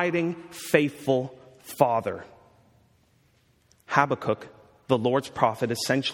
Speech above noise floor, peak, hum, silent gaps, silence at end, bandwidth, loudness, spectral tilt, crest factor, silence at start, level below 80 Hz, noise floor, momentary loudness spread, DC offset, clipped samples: 39 dB; -2 dBFS; none; none; 0 s; 17.5 kHz; -26 LUFS; -5 dB/octave; 26 dB; 0 s; -66 dBFS; -64 dBFS; 13 LU; under 0.1%; under 0.1%